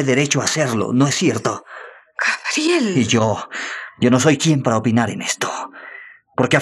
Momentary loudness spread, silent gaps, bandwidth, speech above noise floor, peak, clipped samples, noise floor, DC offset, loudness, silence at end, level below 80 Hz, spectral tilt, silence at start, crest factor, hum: 17 LU; none; 13 kHz; 22 dB; 0 dBFS; under 0.1%; -40 dBFS; under 0.1%; -18 LUFS; 0 s; -60 dBFS; -4.5 dB/octave; 0 s; 18 dB; none